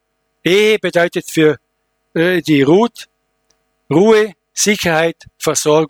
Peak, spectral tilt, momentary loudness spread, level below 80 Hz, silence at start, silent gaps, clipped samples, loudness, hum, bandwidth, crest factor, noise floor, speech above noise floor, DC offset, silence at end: 0 dBFS; -4 dB/octave; 9 LU; -54 dBFS; 0.45 s; none; under 0.1%; -14 LUFS; none; 18.5 kHz; 14 dB; -67 dBFS; 54 dB; under 0.1%; 0 s